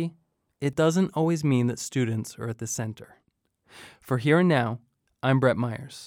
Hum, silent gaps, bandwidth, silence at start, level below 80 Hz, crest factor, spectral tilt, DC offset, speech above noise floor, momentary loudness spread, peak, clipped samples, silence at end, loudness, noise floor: none; none; 16 kHz; 0 s; -64 dBFS; 18 dB; -6 dB/octave; under 0.1%; 45 dB; 13 LU; -8 dBFS; under 0.1%; 0 s; -26 LUFS; -70 dBFS